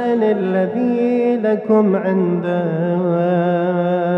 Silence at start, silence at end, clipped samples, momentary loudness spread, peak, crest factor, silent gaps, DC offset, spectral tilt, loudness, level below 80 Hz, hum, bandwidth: 0 s; 0 s; under 0.1%; 4 LU; -4 dBFS; 12 dB; none; under 0.1%; -10 dB/octave; -17 LUFS; -66 dBFS; none; 5.8 kHz